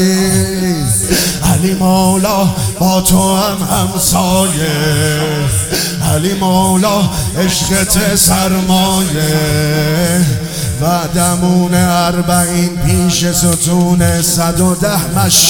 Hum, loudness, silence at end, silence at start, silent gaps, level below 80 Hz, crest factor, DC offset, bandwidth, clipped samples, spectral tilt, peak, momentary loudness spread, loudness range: none; -11 LUFS; 0 s; 0 s; none; -28 dBFS; 12 dB; under 0.1%; 18.5 kHz; under 0.1%; -4 dB/octave; 0 dBFS; 4 LU; 1 LU